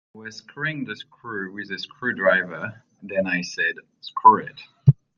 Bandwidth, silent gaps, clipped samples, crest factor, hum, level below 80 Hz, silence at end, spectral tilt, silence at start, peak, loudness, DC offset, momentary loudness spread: 7.2 kHz; none; under 0.1%; 22 dB; none; -56 dBFS; 0.25 s; -6.5 dB/octave; 0.15 s; -2 dBFS; -22 LUFS; under 0.1%; 21 LU